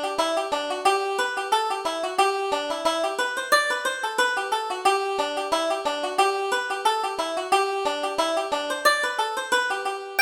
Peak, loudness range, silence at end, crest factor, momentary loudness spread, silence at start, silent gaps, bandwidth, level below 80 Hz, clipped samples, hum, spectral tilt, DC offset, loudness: -6 dBFS; 1 LU; 0 s; 18 dB; 5 LU; 0 s; none; over 20 kHz; -64 dBFS; under 0.1%; none; -0.5 dB/octave; under 0.1%; -24 LUFS